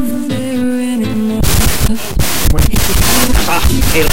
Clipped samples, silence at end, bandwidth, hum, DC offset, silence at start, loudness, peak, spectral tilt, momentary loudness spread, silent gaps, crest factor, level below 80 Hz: under 0.1%; 0 s; 17.5 kHz; none; 20%; 0 s; -13 LUFS; 0 dBFS; -4 dB/octave; 5 LU; none; 10 dB; -16 dBFS